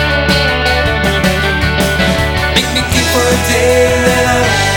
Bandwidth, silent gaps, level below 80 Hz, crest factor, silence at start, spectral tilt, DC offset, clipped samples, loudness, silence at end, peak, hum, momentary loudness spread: 19.5 kHz; none; -22 dBFS; 12 dB; 0 s; -4 dB/octave; under 0.1%; under 0.1%; -11 LUFS; 0 s; 0 dBFS; none; 3 LU